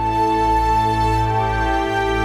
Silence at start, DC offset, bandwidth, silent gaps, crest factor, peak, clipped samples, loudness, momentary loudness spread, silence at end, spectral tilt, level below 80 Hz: 0 s; 0.3%; 15 kHz; none; 10 dB; -8 dBFS; under 0.1%; -18 LUFS; 3 LU; 0 s; -6 dB/octave; -28 dBFS